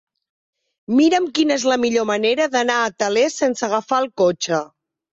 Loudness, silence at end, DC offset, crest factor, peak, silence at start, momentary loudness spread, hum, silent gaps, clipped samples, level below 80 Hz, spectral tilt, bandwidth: -18 LUFS; 0.45 s; under 0.1%; 14 dB; -4 dBFS; 0.9 s; 6 LU; none; none; under 0.1%; -64 dBFS; -3.5 dB/octave; 8 kHz